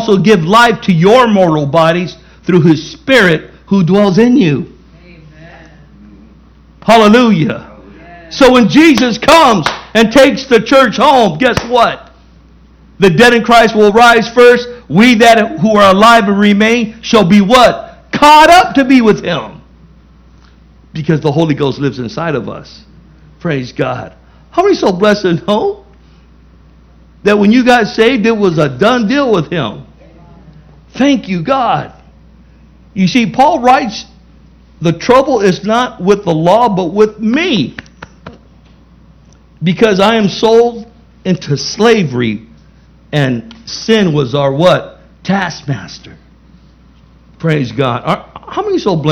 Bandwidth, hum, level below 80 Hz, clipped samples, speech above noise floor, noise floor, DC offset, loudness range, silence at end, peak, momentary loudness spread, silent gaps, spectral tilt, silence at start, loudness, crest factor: 17 kHz; none; -40 dBFS; 2%; 33 dB; -42 dBFS; under 0.1%; 9 LU; 0 s; 0 dBFS; 14 LU; none; -5.5 dB/octave; 0 s; -9 LUFS; 10 dB